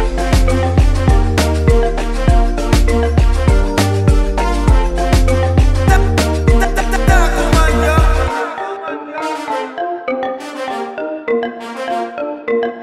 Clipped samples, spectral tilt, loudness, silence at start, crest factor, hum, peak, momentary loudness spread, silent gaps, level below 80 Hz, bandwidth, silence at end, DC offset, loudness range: under 0.1%; -6 dB/octave; -15 LUFS; 0 s; 12 dB; none; 0 dBFS; 10 LU; none; -16 dBFS; 14 kHz; 0 s; under 0.1%; 7 LU